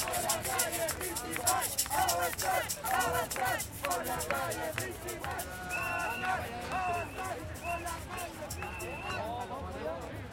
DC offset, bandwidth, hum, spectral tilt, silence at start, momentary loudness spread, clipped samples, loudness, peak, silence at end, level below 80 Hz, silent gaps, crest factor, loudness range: under 0.1%; 17 kHz; none; -2.5 dB/octave; 0 s; 9 LU; under 0.1%; -34 LUFS; -14 dBFS; 0 s; -54 dBFS; none; 20 dB; 6 LU